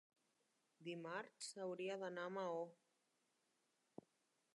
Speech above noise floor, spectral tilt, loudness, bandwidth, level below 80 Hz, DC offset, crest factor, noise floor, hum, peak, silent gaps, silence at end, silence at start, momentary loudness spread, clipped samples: 37 dB; -4 dB/octave; -49 LUFS; 11 kHz; under -90 dBFS; under 0.1%; 18 dB; -85 dBFS; none; -34 dBFS; none; 1.8 s; 0.8 s; 18 LU; under 0.1%